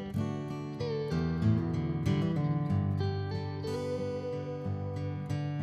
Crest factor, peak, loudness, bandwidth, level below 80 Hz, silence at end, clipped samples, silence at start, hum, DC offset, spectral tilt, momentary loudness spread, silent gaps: 16 dB; -16 dBFS; -33 LUFS; 9.6 kHz; -52 dBFS; 0 s; under 0.1%; 0 s; none; under 0.1%; -8.5 dB/octave; 7 LU; none